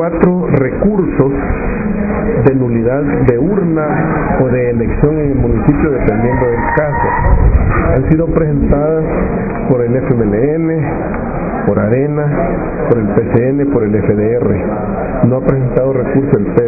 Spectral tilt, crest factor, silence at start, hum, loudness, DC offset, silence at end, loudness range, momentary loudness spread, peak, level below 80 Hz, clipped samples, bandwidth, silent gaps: -13.5 dB/octave; 12 dB; 0 s; none; -13 LUFS; under 0.1%; 0 s; 2 LU; 5 LU; 0 dBFS; -22 dBFS; 0.1%; 2.7 kHz; none